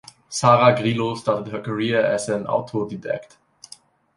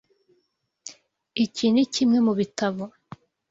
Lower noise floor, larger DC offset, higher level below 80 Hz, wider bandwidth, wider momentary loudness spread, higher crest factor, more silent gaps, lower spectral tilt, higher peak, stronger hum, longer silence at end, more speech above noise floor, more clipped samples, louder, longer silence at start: second, -49 dBFS vs -73 dBFS; neither; first, -60 dBFS vs -66 dBFS; first, 11.5 kHz vs 7.8 kHz; second, 14 LU vs 22 LU; about the same, 20 dB vs 16 dB; neither; about the same, -5 dB/octave vs -5 dB/octave; first, -2 dBFS vs -10 dBFS; neither; first, 0.9 s vs 0.6 s; second, 28 dB vs 51 dB; neither; about the same, -21 LUFS vs -23 LUFS; second, 0.3 s vs 0.85 s